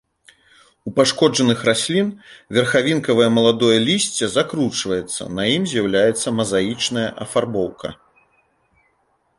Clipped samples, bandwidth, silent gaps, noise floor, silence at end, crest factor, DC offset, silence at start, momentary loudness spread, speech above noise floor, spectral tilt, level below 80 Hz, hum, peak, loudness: under 0.1%; 11.5 kHz; none; -65 dBFS; 1.45 s; 18 dB; under 0.1%; 0.85 s; 9 LU; 46 dB; -4 dB/octave; -54 dBFS; none; -2 dBFS; -18 LUFS